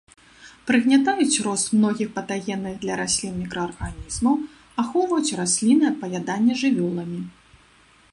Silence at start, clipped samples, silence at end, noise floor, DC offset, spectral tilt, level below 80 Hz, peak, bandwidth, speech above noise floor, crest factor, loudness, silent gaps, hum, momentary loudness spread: 0.4 s; under 0.1%; 0.8 s; -55 dBFS; under 0.1%; -4 dB/octave; -48 dBFS; -6 dBFS; 11.5 kHz; 33 dB; 18 dB; -22 LUFS; none; none; 12 LU